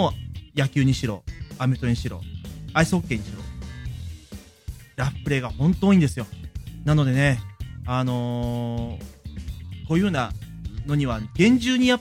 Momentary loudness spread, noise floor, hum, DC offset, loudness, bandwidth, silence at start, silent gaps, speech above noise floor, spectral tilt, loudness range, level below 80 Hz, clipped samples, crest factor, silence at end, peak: 18 LU; -43 dBFS; none; under 0.1%; -23 LUFS; 16 kHz; 0 s; none; 21 dB; -6.5 dB/octave; 5 LU; -40 dBFS; under 0.1%; 18 dB; 0 s; -6 dBFS